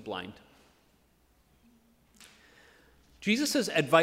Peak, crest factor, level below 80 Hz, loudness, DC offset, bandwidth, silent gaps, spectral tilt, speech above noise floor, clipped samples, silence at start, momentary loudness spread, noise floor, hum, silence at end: -8 dBFS; 24 dB; -68 dBFS; -29 LUFS; under 0.1%; 16 kHz; none; -4 dB/octave; 40 dB; under 0.1%; 0 s; 20 LU; -67 dBFS; none; 0 s